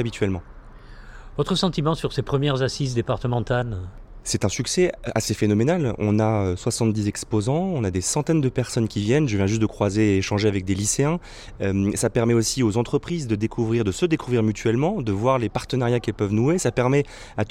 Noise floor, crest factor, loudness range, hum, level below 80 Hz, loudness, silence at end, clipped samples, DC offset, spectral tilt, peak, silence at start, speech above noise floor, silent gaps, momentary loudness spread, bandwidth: -42 dBFS; 16 dB; 2 LU; none; -42 dBFS; -23 LUFS; 0 s; under 0.1%; under 0.1%; -5.5 dB/octave; -6 dBFS; 0 s; 20 dB; none; 6 LU; 15.5 kHz